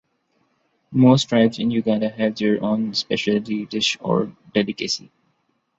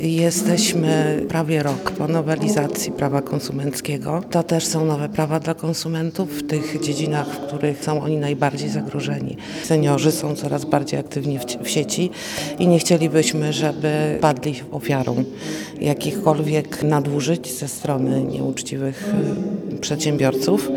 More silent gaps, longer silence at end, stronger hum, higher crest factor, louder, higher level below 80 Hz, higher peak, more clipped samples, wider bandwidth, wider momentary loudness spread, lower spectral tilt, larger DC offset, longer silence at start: neither; first, 0.8 s vs 0 s; neither; about the same, 18 dB vs 20 dB; about the same, -20 LUFS vs -21 LUFS; about the same, -60 dBFS vs -56 dBFS; about the same, -4 dBFS vs -2 dBFS; neither; second, 8 kHz vs 19.5 kHz; about the same, 9 LU vs 8 LU; about the same, -5.5 dB/octave vs -5.5 dB/octave; neither; first, 0.9 s vs 0 s